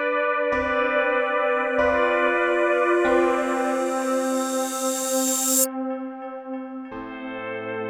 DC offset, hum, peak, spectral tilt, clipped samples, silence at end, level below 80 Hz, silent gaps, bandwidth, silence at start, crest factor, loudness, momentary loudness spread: under 0.1%; none; -8 dBFS; -2 dB/octave; under 0.1%; 0 s; -54 dBFS; none; 19.5 kHz; 0 s; 16 dB; -22 LUFS; 14 LU